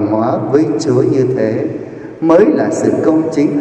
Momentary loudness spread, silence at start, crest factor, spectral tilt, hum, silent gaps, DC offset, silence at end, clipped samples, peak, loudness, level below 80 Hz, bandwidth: 9 LU; 0 s; 12 dB; -7.5 dB/octave; none; none; under 0.1%; 0 s; under 0.1%; 0 dBFS; -13 LUFS; -54 dBFS; 9 kHz